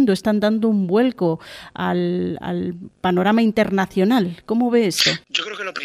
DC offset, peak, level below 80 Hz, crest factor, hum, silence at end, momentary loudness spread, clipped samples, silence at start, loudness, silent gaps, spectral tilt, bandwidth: under 0.1%; -2 dBFS; -56 dBFS; 16 dB; none; 0 s; 9 LU; under 0.1%; 0 s; -19 LUFS; none; -5 dB/octave; 15.5 kHz